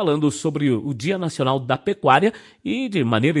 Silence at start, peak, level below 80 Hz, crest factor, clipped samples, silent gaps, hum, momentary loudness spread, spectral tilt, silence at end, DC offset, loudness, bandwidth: 0 s; 0 dBFS; -62 dBFS; 20 dB; under 0.1%; none; none; 7 LU; -6 dB/octave; 0 s; under 0.1%; -21 LUFS; 11.5 kHz